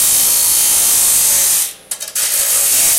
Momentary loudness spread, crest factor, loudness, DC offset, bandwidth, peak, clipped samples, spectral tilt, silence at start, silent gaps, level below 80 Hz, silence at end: 9 LU; 14 dB; -10 LUFS; under 0.1%; 17 kHz; 0 dBFS; under 0.1%; 2 dB/octave; 0 s; none; -48 dBFS; 0 s